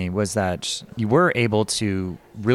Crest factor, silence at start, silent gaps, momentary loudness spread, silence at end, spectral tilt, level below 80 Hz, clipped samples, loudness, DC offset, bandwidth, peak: 16 dB; 0 s; none; 9 LU; 0 s; -5 dB/octave; -54 dBFS; under 0.1%; -22 LUFS; under 0.1%; 14.5 kHz; -6 dBFS